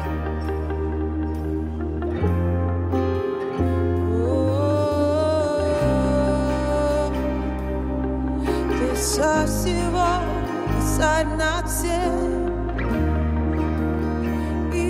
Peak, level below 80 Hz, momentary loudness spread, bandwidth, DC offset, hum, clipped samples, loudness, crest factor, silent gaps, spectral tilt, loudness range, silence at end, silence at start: -8 dBFS; -30 dBFS; 6 LU; 15.5 kHz; under 0.1%; none; under 0.1%; -23 LUFS; 14 dB; none; -6 dB/octave; 3 LU; 0 s; 0 s